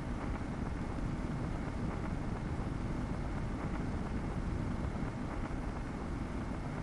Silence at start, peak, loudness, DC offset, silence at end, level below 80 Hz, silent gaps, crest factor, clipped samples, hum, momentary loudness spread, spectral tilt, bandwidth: 0 s; -24 dBFS; -39 LUFS; under 0.1%; 0 s; -42 dBFS; none; 14 dB; under 0.1%; none; 2 LU; -7.5 dB/octave; 11.5 kHz